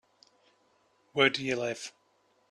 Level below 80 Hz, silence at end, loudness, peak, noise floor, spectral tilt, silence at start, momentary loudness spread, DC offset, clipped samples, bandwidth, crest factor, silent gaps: -74 dBFS; 0.6 s; -29 LUFS; -8 dBFS; -70 dBFS; -3.5 dB/octave; 1.15 s; 15 LU; under 0.1%; under 0.1%; 12 kHz; 26 dB; none